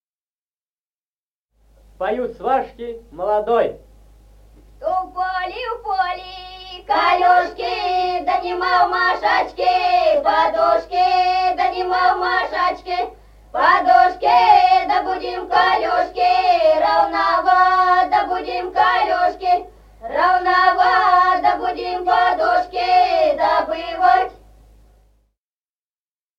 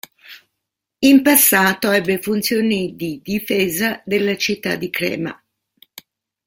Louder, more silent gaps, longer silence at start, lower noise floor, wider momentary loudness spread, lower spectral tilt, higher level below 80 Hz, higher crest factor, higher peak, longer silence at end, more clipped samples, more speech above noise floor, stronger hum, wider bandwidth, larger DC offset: about the same, -17 LUFS vs -17 LUFS; neither; first, 2 s vs 0.3 s; first, under -90 dBFS vs -79 dBFS; second, 11 LU vs 14 LU; about the same, -4 dB/octave vs -3.5 dB/octave; first, -48 dBFS vs -56 dBFS; about the same, 16 dB vs 18 dB; about the same, 0 dBFS vs 0 dBFS; first, 2.05 s vs 1.15 s; neither; first, over 73 dB vs 62 dB; neither; second, 7.2 kHz vs 17 kHz; neither